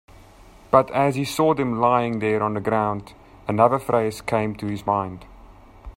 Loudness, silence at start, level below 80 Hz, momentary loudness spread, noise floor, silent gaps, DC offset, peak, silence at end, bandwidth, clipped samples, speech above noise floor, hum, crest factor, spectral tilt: -22 LUFS; 0.7 s; -50 dBFS; 9 LU; -48 dBFS; none; under 0.1%; 0 dBFS; 0.05 s; 16 kHz; under 0.1%; 27 dB; none; 22 dB; -6.5 dB/octave